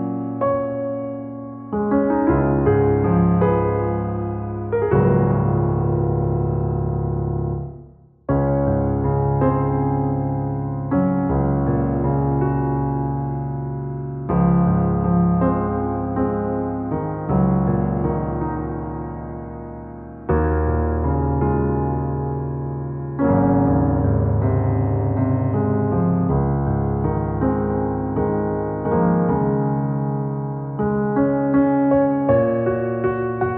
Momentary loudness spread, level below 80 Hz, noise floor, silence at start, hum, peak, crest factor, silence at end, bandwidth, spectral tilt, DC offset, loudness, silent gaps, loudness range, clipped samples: 9 LU; -32 dBFS; -45 dBFS; 0 s; none; -4 dBFS; 14 dB; 0 s; 3.1 kHz; -14.5 dB/octave; under 0.1%; -20 LUFS; none; 3 LU; under 0.1%